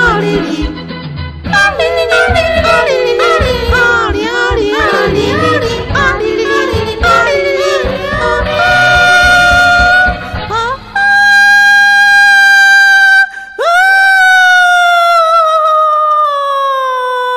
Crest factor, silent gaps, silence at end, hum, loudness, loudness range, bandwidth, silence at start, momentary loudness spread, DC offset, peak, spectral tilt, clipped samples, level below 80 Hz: 8 dB; none; 0 s; none; -8 LUFS; 6 LU; 15.5 kHz; 0 s; 10 LU; under 0.1%; 0 dBFS; -3.5 dB/octave; under 0.1%; -26 dBFS